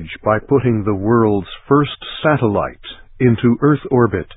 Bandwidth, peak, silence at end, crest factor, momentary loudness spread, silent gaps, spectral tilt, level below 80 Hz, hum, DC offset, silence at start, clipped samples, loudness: 4 kHz; 0 dBFS; 0 s; 16 dB; 8 LU; none; -13 dB/octave; -40 dBFS; none; under 0.1%; 0 s; under 0.1%; -16 LUFS